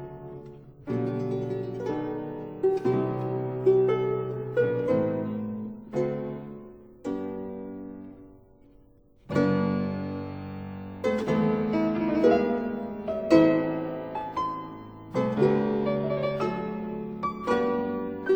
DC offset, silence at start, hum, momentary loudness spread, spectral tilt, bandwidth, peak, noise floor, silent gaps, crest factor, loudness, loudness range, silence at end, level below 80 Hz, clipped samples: under 0.1%; 0 s; none; 16 LU; -8.5 dB/octave; over 20 kHz; -4 dBFS; -57 dBFS; none; 22 dB; -28 LUFS; 8 LU; 0 s; -56 dBFS; under 0.1%